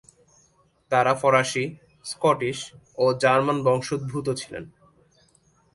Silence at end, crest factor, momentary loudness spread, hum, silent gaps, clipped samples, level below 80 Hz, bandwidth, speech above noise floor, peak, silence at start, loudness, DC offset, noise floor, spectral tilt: 1.05 s; 20 dB; 16 LU; none; none; under 0.1%; -62 dBFS; 11.5 kHz; 40 dB; -4 dBFS; 0.9 s; -23 LUFS; under 0.1%; -63 dBFS; -5 dB/octave